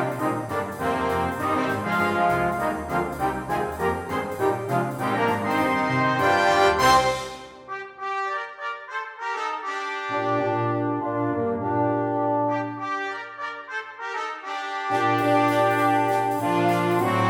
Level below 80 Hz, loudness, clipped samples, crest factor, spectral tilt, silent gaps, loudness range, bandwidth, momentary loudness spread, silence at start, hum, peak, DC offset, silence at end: -52 dBFS; -24 LUFS; under 0.1%; 18 dB; -5.5 dB/octave; none; 6 LU; 17.5 kHz; 11 LU; 0 s; none; -6 dBFS; under 0.1%; 0 s